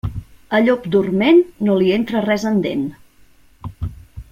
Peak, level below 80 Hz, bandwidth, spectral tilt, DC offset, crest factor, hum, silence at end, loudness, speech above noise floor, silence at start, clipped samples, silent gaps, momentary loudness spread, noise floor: -2 dBFS; -40 dBFS; 15.5 kHz; -7 dB/octave; under 0.1%; 16 dB; none; 0.1 s; -17 LUFS; 33 dB; 0.05 s; under 0.1%; none; 17 LU; -49 dBFS